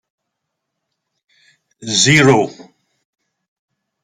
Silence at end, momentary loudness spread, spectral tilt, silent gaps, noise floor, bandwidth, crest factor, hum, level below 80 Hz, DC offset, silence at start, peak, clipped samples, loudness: 1.4 s; 16 LU; -3.5 dB/octave; none; -77 dBFS; 14 kHz; 20 dB; none; -54 dBFS; under 0.1%; 1.8 s; 0 dBFS; under 0.1%; -12 LUFS